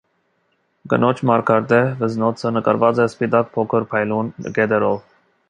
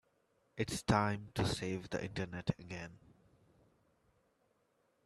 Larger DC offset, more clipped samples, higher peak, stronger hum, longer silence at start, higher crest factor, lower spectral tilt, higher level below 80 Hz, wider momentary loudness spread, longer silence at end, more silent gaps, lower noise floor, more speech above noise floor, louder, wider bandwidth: neither; neither; first, -2 dBFS vs -16 dBFS; neither; first, 0.85 s vs 0.55 s; second, 18 dB vs 26 dB; first, -7.5 dB/octave vs -5.5 dB/octave; about the same, -60 dBFS vs -60 dBFS; second, 6 LU vs 14 LU; second, 0.5 s vs 2.1 s; neither; second, -66 dBFS vs -77 dBFS; first, 48 dB vs 40 dB; first, -18 LUFS vs -38 LUFS; second, 9.6 kHz vs 13.5 kHz